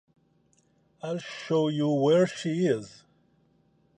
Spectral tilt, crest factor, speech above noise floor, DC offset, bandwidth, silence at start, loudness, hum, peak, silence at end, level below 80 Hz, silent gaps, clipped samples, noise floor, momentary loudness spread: -6.5 dB/octave; 18 dB; 41 dB; under 0.1%; 10.5 kHz; 1.05 s; -27 LUFS; none; -10 dBFS; 1.1 s; -74 dBFS; none; under 0.1%; -67 dBFS; 13 LU